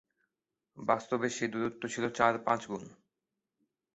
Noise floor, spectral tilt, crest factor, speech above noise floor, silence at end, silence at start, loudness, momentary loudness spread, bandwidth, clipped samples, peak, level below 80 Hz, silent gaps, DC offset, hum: -88 dBFS; -4 dB/octave; 24 dB; 56 dB; 1 s; 0.75 s; -33 LUFS; 10 LU; 8 kHz; under 0.1%; -10 dBFS; -72 dBFS; none; under 0.1%; none